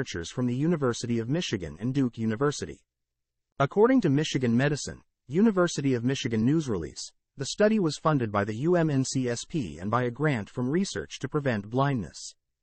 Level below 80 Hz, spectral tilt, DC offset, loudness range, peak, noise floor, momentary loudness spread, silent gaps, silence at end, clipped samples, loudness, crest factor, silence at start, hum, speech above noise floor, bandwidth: -56 dBFS; -6 dB/octave; under 0.1%; 4 LU; -10 dBFS; -84 dBFS; 10 LU; 3.52-3.56 s; 0.3 s; under 0.1%; -27 LUFS; 18 dB; 0 s; none; 57 dB; 8.8 kHz